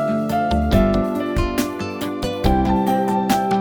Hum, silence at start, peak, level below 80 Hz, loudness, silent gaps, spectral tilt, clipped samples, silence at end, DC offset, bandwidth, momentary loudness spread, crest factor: none; 0 s; -2 dBFS; -28 dBFS; -20 LUFS; none; -6.5 dB/octave; under 0.1%; 0 s; under 0.1%; 19.5 kHz; 8 LU; 16 dB